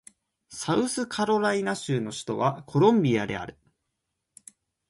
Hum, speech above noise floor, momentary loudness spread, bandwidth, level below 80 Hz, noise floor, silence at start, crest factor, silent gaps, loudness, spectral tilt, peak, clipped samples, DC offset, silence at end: none; 56 dB; 14 LU; 11.5 kHz; -62 dBFS; -81 dBFS; 0.5 s; 20 dB; none; -26 LUFS; -5.5 dB/octave; -8 dBFS; under 0.1%; under 0.1%; 1.4 s